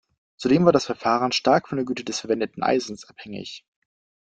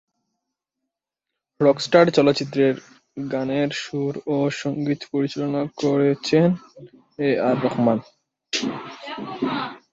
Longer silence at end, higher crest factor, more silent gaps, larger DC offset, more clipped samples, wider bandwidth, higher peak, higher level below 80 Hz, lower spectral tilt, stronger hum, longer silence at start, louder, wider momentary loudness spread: first, 0.7 s vs 0.15 s; about the same, 22 dB vs 20 dB; neither; neither; neither; first, 9.2 kHz vs 7.8 kHz; about the same, -2 dBFS vs -2 dBFS; about the same, -60 dBFS vs -64 dBFS; about the same, -5 dB/octave vs -6 dB/octave; neither; second, 0.4 s vs 1.6 s; about the same, -22 LUFS vs -22 LUFS; first, 18 LU vs 13 LU